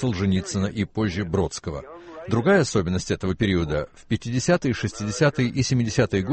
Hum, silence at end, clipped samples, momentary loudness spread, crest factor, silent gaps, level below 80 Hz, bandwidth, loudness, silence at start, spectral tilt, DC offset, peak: none; 0 s; under 0.1%; 9 LU; 18 dB; none; -44 dBFS; 8.8 kHz; -23 LUFS; 0 s; -5.5 dB/octave; under 0.1%; -6 dBFS